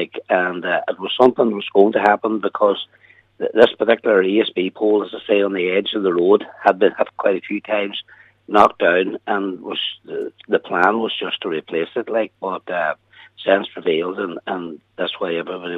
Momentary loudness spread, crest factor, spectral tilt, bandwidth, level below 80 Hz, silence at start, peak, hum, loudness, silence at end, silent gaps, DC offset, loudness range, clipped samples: 11 LU; 18 dB; -6.5 dB/octave; 7 kHz; -66 dBFS; 0 s; 0 dBFS; none; -19 LUFS; 0 s; none; under 0.1%; 5 LU; under 0.1%